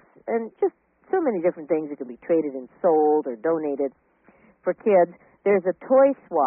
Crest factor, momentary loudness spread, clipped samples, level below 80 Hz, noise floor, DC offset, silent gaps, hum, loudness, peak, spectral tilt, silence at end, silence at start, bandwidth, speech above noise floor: 16 dB; 10 LU; under 0.1%; -72 dBFS; -57 dBFS; under 0.1%; none; none; -23 LUFS; -8 dBFS; -2.5 dB/octave; 0 s; 0.25 s; 3 kHz; 35 dB